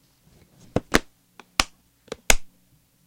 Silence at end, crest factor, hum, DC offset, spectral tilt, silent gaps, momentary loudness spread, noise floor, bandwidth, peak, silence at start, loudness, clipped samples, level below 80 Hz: 0.6 s; 28 dB; none; under 0.1%; -2 dB/octave; none; 15 LU; -61 dBFS; 16.5 kHz; 0 dBFS; 0.75 s; -24 LUFS; under 0.1%; -34 dBFS